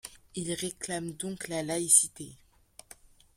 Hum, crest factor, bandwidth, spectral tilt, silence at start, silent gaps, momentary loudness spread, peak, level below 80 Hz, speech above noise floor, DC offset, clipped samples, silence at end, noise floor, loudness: none; 26 dB; 16.5 kHz; -2.5 dB/octave; 0.05 s; none; 19 LU; -6 dBFS; -64 dBFS; 25 dB; under 0.1%; under 0.1%; 1 s; -56 dBFS; -28 LUFS